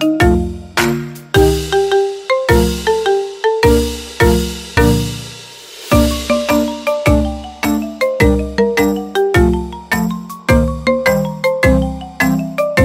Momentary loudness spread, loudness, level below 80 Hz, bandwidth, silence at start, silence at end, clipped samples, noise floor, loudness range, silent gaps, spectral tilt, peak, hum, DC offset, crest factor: 8 LU; -15 LUFS; -24 dBFS; 16.5 kHz; 0 s; 0 s; under 0.1%; -34 dBFS; 1 LU; none; -5.5 dB/octave; 0 dBFS; none; under 0.1%; 14 dB